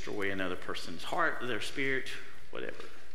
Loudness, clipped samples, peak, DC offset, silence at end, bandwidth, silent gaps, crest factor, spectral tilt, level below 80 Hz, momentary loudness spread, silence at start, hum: -35 LUFS; under 0.1%; -14 dBFS; 3%; 0 s; 16 kHz; none; 20 dB; -4 dB/octave; -64 dBFS; 12 LU; 0 s; none